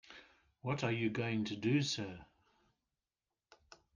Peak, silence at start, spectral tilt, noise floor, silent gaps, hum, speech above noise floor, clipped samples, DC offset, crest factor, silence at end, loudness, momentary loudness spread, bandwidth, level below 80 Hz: -22 dBFS; 0.1 s; -5.5 dB/octave; under -90 dBFS; none; none; over 54 dB; under 0.1%; under 0.1%; 18 dB; 1.7 s; -37 LUFS; 21 LU; 10 kHz; -74 dBFS